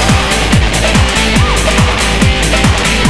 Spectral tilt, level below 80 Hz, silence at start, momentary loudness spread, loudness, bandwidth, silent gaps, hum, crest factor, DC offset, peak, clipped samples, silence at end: -4 dB/octave; -16 dBFS; 0 s; 1 LU; -10 LUFS; 11 kHz; none; none; 10 dB; 2%; 0 dBFS; under 0.1%; 0 s